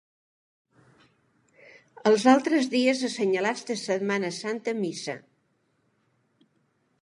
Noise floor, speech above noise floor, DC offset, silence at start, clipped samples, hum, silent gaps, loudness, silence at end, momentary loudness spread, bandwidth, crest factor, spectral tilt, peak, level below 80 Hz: -71 dBFS; 46 dB; under 0.1%; 2.05 s; under 0.1%; none; none; -25 LUFS; 1.85 s; 12 LU; 11.5 kHz; 22 dB; -4.5 dB/octave; -6 dBFS; -80 dBFS